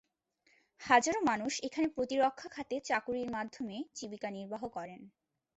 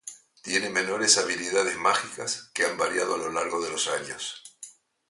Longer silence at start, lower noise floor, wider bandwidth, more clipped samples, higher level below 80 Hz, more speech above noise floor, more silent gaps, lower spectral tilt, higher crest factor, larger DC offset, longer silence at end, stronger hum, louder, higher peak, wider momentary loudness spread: first, 0.8 s vs 0.05 s; first, -74 dBFS vs -49 dBFS; second, 8.2 kHz vs 11.5 kHz; neither; about the same, -72 dBFS vs -68 dBFS; first, 40 dB vs 22 dB; neither; first, -3 dB/octave vs -1 dB/octave; about the same, 24 dB vs 22 dB; neither; about the same, 0.5 s vs 0.4 s; neither; second, -34 LUFS vs -26 LUFS; second, -10 dBFS vs -6 dBFS; second, 16 LU vs 21 LU